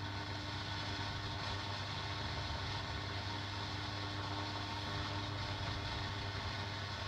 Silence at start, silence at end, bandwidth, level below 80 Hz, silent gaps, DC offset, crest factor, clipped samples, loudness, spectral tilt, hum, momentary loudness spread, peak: 0 s; 0 s; 11 kHz; -54 dBFS; none; under 0.1%; 14 dB; under 0.1%; -41 LUFS; -4.5 dB/octave; none; 1 LU; -28 dBFS